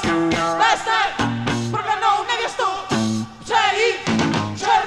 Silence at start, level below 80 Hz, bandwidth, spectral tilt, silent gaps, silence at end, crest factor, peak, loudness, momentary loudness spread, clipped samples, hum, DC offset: 0 s; -48 dBFS; 12.5 kHz; -4 dB/octave; none; 0 s; 16 dB; -4 dBFS; -19 LUFS; 5 LU; under 0.1%; none; under 0.1%